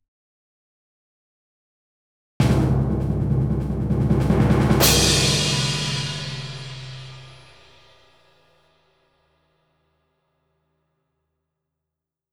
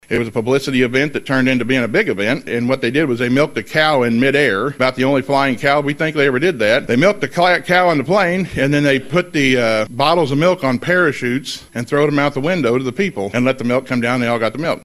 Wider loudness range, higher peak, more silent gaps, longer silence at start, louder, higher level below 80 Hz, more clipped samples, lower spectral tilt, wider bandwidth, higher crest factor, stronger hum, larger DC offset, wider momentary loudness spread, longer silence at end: first, 15 LU vs 2 LU; about the same, -2 dBFS vs 0 dBFS; neither; first, 2.4 s vs 0.1 s; second, -20 LUFS vs -16 LUFS; first, -34 dBFS vs -48 dBFS; neither; about the same, -4.5 dB/octave vs -5.5 dB/octave; first, over 20 kHz vs 14.5 kHz; first, 22 dB vs 16 dB; neither; neither; first, 19 LU vs 5 LU; first, 5 s vs 0.05 s